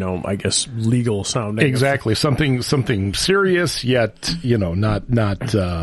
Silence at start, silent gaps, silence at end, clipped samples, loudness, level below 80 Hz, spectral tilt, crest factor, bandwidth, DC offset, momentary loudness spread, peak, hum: 0 s; none; 0 s; under 0.1%; -19 LUFS; -38 dBFS; -5 dB/octave; 18 dB; 12 kHz; under 0.1%; 5 LU; -2 dBFS; none